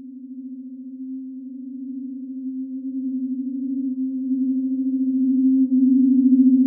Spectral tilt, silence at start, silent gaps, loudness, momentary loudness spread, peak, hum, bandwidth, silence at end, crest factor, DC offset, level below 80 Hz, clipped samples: -14 dB/octave; 0 s; none; -21 LUFS; 19 LU; -6 dBFS; none; 0.6 kHz; 0 s; 14 dB; under 0.1%; -86 dBFS; under 0.1%